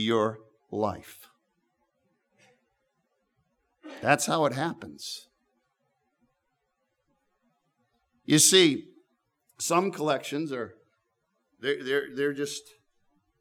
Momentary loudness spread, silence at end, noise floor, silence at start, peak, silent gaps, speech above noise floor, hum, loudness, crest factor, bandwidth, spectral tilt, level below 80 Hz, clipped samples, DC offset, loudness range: 20 LU; 0.8 s; -78 dBFS; 0 s; -6 dBFS; none; 52 dB; none; -26 LUFS; 24 dB; 19.5 kHz; -3 dB/octave; -76 dBFS; under 0.1%; under 0.1%; 15 LU